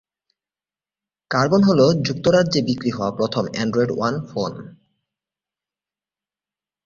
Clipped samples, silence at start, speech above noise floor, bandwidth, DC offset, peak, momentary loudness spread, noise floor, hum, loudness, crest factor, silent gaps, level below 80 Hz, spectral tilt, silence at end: under 0.1%; 1.3 s; over 71 dB; 7.4 kHz; under 0.1%; -4 dBFS; 11 LU; under -90 dBFS; none; -19 LUFS; 18 dB; none; -56 dBFS; -6 dB/octave; 2.15 s